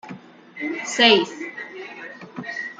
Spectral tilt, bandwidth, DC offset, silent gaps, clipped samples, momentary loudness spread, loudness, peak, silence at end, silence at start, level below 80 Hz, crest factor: -2.5 dB/octave; 9.4 kHz; under 0.1%; none; under 0.1%; 22 LU; -19 LUFS; -2 dBFS; 0.05 s; 0.05 s; -74 dBFS; 22 dB